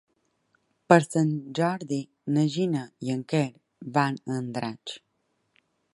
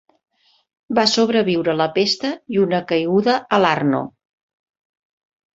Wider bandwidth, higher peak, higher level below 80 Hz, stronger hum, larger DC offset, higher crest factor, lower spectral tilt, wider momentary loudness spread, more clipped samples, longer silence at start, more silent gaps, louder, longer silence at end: first, 11.5 kHz vs 8 kHz; about the same, -2 dBFS vs -2 dBFS; second, -72 dBFS vs -62 dBFS; neither; neither; first, 26 dB vs 18 dB; first, -6.5 dB/octave vs -5 dB/octave; first, 13 LU vs 6 LU; neither; about the same, 0.9 s vs 0.9 s; neither; second, -27 LUFS vs -18 LUFS; second, 0.95 s vs 1.5 s